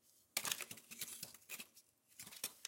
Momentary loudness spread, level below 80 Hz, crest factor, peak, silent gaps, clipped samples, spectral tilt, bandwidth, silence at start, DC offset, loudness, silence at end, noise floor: 15 LU; under -90 dBFS; 32 dB; -18 dBFS; none; under 0.1%; 0.5 dB/octave; 17 kHz; 0.05 s; under 0.1%; -46 LUFS; 0 s; -70 dBFS